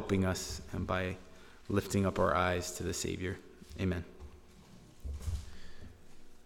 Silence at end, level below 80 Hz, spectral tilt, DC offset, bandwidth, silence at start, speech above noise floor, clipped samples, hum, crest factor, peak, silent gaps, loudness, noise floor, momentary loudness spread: 0 s; -48 dBFS; -5 dB/octave; under 0.1%; 17 kHz; 0 s; 22 dB; under 0.1%; none; 20 dB; -16 dBFS; none; -35 LUFS; -56 dBFS; 24 LU